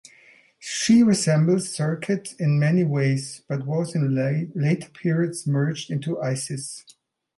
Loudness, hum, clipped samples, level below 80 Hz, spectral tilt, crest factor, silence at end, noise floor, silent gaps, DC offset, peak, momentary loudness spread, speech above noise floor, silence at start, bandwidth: -23 LUFS; none; under 0.1%; -66 dBFS; -6 dB/octave; 16 dB; 0.55 s; -54 dBFS; none; under 0.1%; -6 dBFS; 12 LU; 32 dB; 0.6 s; 11.5 kHz